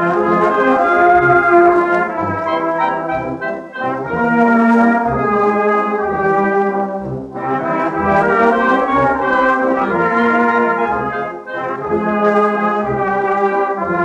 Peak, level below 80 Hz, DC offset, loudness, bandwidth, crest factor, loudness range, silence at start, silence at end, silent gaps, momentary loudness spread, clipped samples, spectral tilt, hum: -2 dBFS; -46 dBFS; under 0.1%; -14 LUFS; 9 kHz; 14 dB; 3 LU; 0 s; 0 s; none; 10 LU; under 0.1%; -7.5 dB/octave; none